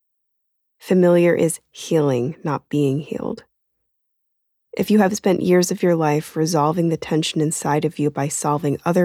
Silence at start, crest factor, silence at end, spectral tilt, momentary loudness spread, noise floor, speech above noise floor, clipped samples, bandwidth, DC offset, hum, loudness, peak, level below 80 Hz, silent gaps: 0.85 s; 16 dB; 0 s; -5.5 dB/octave; 10 LU; -73 dBFS; 54 dB; under 0.1%; 16 kHz; under 0.1%; none; -19 LUFS; -4 dBFS; -60 dBFS; none